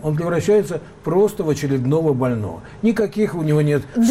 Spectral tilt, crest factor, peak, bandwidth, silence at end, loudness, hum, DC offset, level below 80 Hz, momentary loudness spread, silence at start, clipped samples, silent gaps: -7.5 dB/octave; 10 dB; -8 dBFS; 15.5 kHz; 0 s; -19 LUFS; none; under 0.1%; -48 dBFS; 6 LU; 0 s; under 0.1%; none